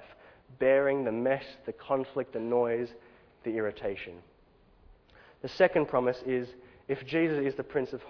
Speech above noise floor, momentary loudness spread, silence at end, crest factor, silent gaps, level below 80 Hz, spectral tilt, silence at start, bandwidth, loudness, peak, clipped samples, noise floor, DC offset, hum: 32 dB; 16 LU; 0 s; 20 dB; none; -64 dBFS; -5 dB/octave; 0 s; 5.4 kHz; -30 LUFS; -10 dBFS; under 0.1%; -62 dBFS; under 0.1%; none